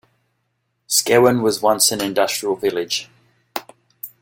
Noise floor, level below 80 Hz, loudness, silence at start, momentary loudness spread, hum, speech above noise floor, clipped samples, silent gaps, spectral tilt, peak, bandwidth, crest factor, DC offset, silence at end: -71 dBFS; -60 dBFS; -17 LUFS; 0.9 s; 17 LU; none; 53 dB; under 0.1%; none; -2.5 dB/octave; -2 dBFS; 17 kHz; 18 dB; under 0.1%; 0.15 s